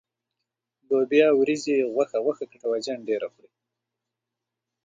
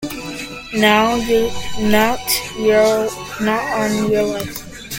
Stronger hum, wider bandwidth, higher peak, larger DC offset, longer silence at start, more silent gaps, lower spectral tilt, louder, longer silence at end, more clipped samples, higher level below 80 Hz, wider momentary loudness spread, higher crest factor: neither; second, 9 kHz vs 17 kHz; second, -6 dBFS vs 0 dBFS; neither; first, 0.9 s vs 0 s; neither; about the same, -4.5 dB/octave vs -4 dB/octave; second, -24 LUFS vs -17 LUFS; first, 1.6 s vs 0 s; neither; second, -78 dBFS vs -40 dBFS; second, 10 LU vs 13 LU; about the same, 20 dB vs 18 dB